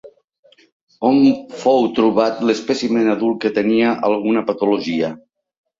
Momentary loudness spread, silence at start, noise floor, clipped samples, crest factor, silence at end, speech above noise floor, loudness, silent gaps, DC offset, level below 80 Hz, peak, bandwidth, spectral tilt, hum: 5 LU; 0.05 s; -55 dBFS; under 0.1%; 16 dB; 0.6 s; 38 dB; -17 LUFS; 0.24-0.28 s, 0.39-0.43 s, 0.72-0.87 s; under 0.1%; -60 dBFS; -2 dBFS; 7.6 kHz; -6 dB/octave; none